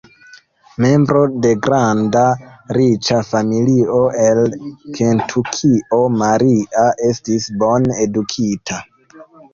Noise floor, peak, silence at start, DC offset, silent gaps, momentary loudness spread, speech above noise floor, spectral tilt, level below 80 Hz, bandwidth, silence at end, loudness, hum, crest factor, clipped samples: -45 dBFS; -2 dBFS; 0.8 s; under 0.1%; none; 6 LU; 30 dB; -6 dB/octave; -50 dBFS; 7.6 kHz; 0.3 s; -15 LUFS; none; 12 dB; under 0.1%